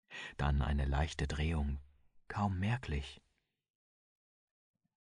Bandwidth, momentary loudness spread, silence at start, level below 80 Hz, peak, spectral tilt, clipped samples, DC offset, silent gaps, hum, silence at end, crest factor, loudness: 10.5 kHz; 11 LU; 0.1 s; -42 dBFS; -20 dBFS; -6.5 dB/octave; under 0.1%; under 0.1%; none; none; 1.85 s; 18 dB; -37 LUFS